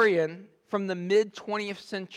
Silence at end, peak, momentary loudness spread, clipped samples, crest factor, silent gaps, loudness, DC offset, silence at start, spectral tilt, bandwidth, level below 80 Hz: 0 s; -12 dBFS; 10 LU; under 0.1%; 16 dB; none; -29 LUFS; under 0.1%; 0 s; -5.5 dB/octave; 10.5 kHz; -80 dBFS